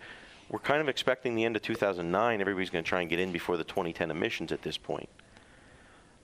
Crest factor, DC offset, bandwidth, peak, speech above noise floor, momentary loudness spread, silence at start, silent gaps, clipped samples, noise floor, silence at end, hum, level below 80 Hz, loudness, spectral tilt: 24 dB; under 0.1%; 15.5 kHz; -8 dBFS; 26 dB; 10 LU; 0 s; none; under 0.1%; -57 dBFS; 0.85 s; none; -62 dBFS; -31 LUFS; -5 dB/octave